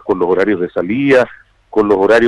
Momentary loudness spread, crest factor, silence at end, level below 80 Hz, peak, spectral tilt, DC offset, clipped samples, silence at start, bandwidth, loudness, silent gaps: 7 LU; 10 dB; 0 s; -48 dBFS; -2 dBFS; -6.5 dB/octave; under 0.1%; under 0.1%; 0.05 s; 11 kHz; -14 LUFS; none